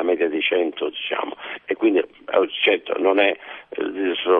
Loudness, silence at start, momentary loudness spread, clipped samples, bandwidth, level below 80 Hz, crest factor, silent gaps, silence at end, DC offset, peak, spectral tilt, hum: -21 LUFS; 0 s; 10 LU; under 0.1%; 4 kHz; -68 dBFS; 16 dB; none; 0 s; under 0.1%; -4 dBFS; -6.5 dB/octave; none